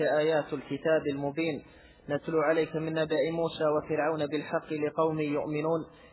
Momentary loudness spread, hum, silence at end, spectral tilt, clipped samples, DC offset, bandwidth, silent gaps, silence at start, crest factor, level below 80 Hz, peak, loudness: 7 LU; none; 0.05 s; -10 dB/octave; under 0.1%; under 0.1%; 4 kHz; none; 0 s; 16 dB; -64 dBFS; -14 dBFS; -30 LUFS